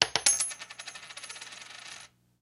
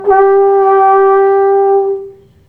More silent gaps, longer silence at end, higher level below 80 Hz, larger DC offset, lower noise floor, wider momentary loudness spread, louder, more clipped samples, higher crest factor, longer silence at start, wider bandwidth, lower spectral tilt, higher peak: neither; about the same, 0.35 s vs 0.35 s; second, -70 dBFS vs -50 dBFS; neither; first, -51 dBFS vs -31 dBFS; first, 20 LU vs 6 LU; second, -28 LUFS vs -9 LUFS; neither; first, 34 dB vs 8 dB; about the same, 0 s vs 0 s; first, 16 kHz vs 3.3 kHz; second, 1 dB/octave vs -8 dB/octave; about the same, 0 dBFS vs 0 dBFS